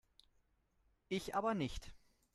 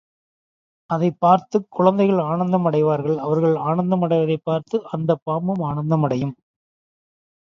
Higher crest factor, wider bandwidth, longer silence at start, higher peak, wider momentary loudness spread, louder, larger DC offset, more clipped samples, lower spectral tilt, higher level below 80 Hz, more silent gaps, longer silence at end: about the same, 20 dB vs 20 dB; first, 13 kHz vs 7 kHz; first, 1.1 s vs 0.9 s; second, -26 dBFS vs 0 dBFS; first, 15 LU vs 7 LU; second, -41 LUFS vs -20 LUFS; neither; neither; second, -5.5 dB/octave vs -9 dB/octave; about the same, -60 dBFS vs -60 dBFS; second, none vs 5.22-5.26 s; second, 0.4 s vs 1.05 s